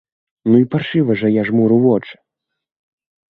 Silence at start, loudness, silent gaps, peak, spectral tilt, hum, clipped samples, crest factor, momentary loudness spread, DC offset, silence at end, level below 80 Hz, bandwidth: 0.45 s; -15 LUFS; none; -2 dBFS; -10.5 dB/octave; none; under 0.1%; 16 dB; 5 LU; under 0.1%; 1.2 s; -58 dBFS; 4.5 kHz